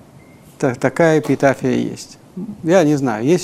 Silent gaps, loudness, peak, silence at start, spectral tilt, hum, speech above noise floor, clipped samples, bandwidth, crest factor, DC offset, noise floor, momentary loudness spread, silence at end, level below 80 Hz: none; -16 LUFS; 0 dBFS; 0.6 s; -6.5 dB/octave; none; 27 dB; under 0.1%; 15 kHz; 16 dB; under 0.1%; -43 dBFS; 17 LU; 0 s; -54 dBFS